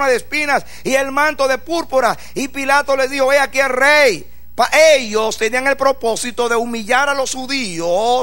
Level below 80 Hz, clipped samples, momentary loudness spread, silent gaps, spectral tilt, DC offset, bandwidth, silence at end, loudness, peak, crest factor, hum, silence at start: -46 dBFS; under 0.1%; 9 LU; none; -2 dB/octave; 3%; 16.5 kHz; 0 s; -15 LUFS; 0 dBFS; 16 dB; none; 0 s